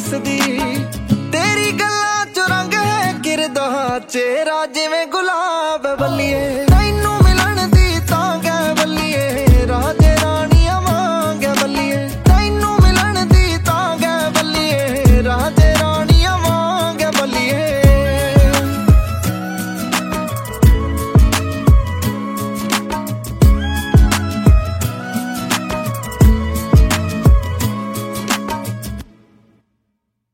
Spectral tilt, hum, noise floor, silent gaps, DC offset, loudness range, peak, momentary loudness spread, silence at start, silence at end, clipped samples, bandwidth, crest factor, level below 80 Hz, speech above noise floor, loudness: -5 dB/octave; none; -71 dBFS; none; under 0.1%; 3 LU; 0 dBFS; 9 LU; 0 s; 1.3 s; under 0.1%; 16.5 kHz; 14 dB; -18 dBFS; 53 dB; -15 LUFS